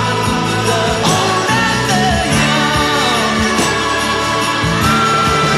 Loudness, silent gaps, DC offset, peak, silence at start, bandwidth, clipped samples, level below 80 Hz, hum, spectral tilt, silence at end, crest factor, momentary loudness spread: -13 LUFS; none; under 0.1%; 0 dBFS; 0 s; 16 kHz; under 0.1%; -32 dBFS; none; -3.5 dB/octave; 0 s; 12 dB; 3 LU